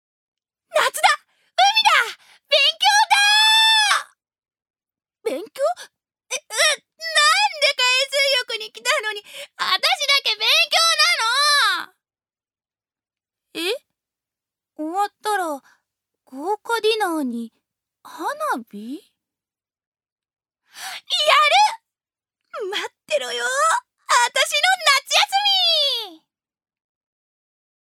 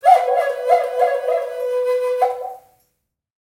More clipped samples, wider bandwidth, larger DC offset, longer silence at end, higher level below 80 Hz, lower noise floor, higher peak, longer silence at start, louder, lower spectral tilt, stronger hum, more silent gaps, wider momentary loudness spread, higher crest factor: neither; about the same, 17 kHz vs 16 kHz; neither; first, 1.7 s vs 0.9 s; second, -86 dBFS vs -74 dBFS; first, under -90 dBFS vs -72 dBFS; about the same, -2 dBFS vs 0 dBFS; first, 0.75 s vs 0.05 s; about the same, -17 LUFS vs -19 LUFS; second, 1.5 dB/octave vs -0.5 dB/octave; neither; first, 4.70-4.74 s, 19.87-19.92 s, 20.12-20.16 s vs none; first, 17 LU vs 7 LU; about the same, 20 dB vs 18 dB